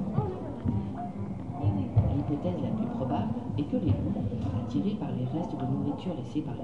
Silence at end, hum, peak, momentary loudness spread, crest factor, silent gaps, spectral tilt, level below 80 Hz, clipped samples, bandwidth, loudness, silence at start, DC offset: 0 s; none; -12 dBFS; 7 LU; 18 dB; none; -10 dB/octave; -48 dBFS; under 0.1%; 7 kHz; -31 LUFS; 0 s; 0.3%